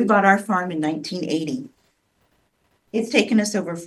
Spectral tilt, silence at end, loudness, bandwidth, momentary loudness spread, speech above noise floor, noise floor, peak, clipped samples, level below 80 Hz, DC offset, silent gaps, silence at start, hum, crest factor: -5 dB/octave; 0 s; -21 LUFS; 12.5 kHz; 12 LU; 45 dB; -66 dBFS; 0 dBFS; under 0.1%; -68 dBFS; under 0.1%; none; 0 s; none; 22 dB